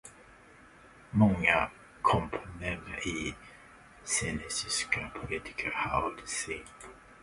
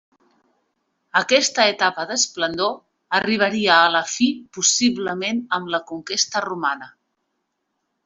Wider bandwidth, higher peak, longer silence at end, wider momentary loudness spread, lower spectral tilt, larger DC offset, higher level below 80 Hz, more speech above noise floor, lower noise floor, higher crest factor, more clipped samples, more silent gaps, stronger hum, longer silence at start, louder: first, 11.5 kHz vs 8.2 kHz; second, -10 dBFS vs -2 dBFS; second, 0 s vs 1.15 s; first, 20 LU vs 9 LU; first, -4 dB/octave vs -1.5 dB/octave; neither; first, -52 dBFS vs -66 dBFS; second, 24 dB vs 55 dB; second, -56 dBFS vs -75 dBFS; about the same, 24 dB vs 20 dB; neither; neither; neither; second, 0.05 s vs 1.15 s; second, -31 LUFS vs -19 LUFS